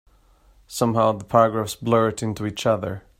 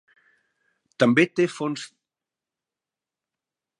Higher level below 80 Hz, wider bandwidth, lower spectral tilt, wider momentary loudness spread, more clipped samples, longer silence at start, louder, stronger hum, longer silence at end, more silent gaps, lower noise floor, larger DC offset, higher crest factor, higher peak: first, -54 dBFS vs -74 dBFS; first, 16 kHz vs 11 kHz; about the same, -6 dB/octave vs -5.5 dB/octave; second, 8 LU vs 16 LU; neither; second, 0.7 s vs 1 s; about the same, -22 LUFS vs -22 LUFS; neither; second, 0.2 s vs 1.95 s; neither; second, -56 dBFS vs -89 dBFS; neither; about the same, 20 dB vs 24 dB; about the same, -2 dBFS vs -4 dBFS